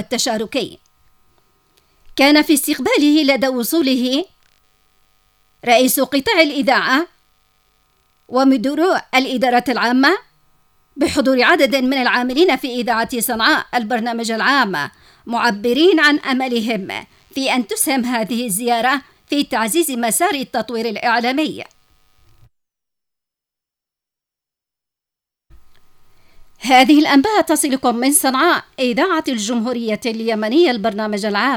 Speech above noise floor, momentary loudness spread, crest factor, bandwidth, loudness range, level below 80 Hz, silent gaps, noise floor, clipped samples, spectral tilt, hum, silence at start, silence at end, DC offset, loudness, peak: 70 dB; 10 LU; 18 dB; 18.5 kHz; 4 LU; -56 dBFS; none; -86 dBFS; under 0.1%; -2.5 dB/octave; none; 0 s; 0 s; under 0.1%; -16 LUFS; 0 dBFS